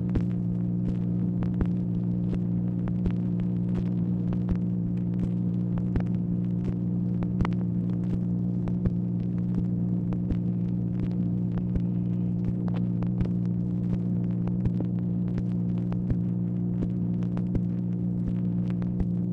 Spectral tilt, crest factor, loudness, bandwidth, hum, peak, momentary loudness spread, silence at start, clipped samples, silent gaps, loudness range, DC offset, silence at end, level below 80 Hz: -11.5 dB/octave; 14 dB; -28 LUFS; 3.6 kHz; none; -12 dBFS; 1 LU; 0 s; under 0.1%; none; 0 LU; under 0.1%; 0 s; -40 dBFS